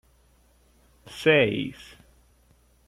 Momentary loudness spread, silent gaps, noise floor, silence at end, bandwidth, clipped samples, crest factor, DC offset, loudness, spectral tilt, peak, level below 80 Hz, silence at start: 24 LU; none; -61 dBFS; 1.15 s; 14 kHz; under 0.1%; 22 dB; under 0.1%; -23 LUFS; -5.5 dB/octave; -8 dBFS; -58 dBFS; 1.1 s